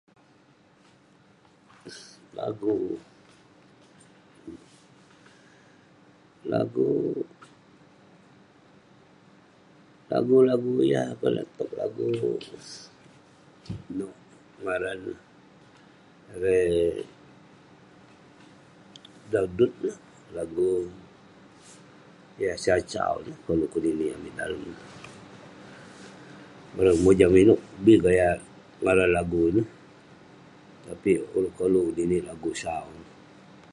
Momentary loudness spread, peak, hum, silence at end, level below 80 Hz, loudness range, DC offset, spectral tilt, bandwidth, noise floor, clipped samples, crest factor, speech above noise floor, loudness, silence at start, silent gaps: 25 LU; -4 dBFS; none; 0.7 s; -52 dBFS; 14 LU; under 0.1%; -6.5 dB/octave; 11.5 kHz; -59 dBFS; under 0.1%; 24 dB; 34 dB; -25 LUFS; 1.85 s; none